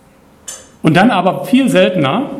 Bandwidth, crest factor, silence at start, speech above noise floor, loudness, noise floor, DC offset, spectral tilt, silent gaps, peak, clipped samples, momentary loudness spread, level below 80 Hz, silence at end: 14.5 kHz; 14 dB; 0.5 s; 25 dB; -12 LUFS; -36 dBFS; under 0.1%; -6 dB/octave; none; 0 dBFS; under 0.1%; 20 LU; -52 dBFS; 0 s